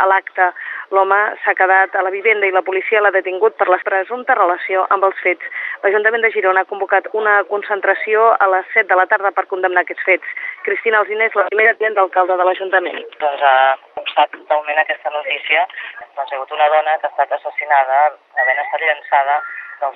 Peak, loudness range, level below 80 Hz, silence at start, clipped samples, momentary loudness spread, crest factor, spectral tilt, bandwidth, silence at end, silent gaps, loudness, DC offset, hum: 0 dBFS; 2 LU; -82 dBFS; 0 s; under 0.1%; 8 LU; 16 dB; -5 dB/octave; 4.2 kHz; 0.05 s; none; -15 LUFS; under 0.1%; none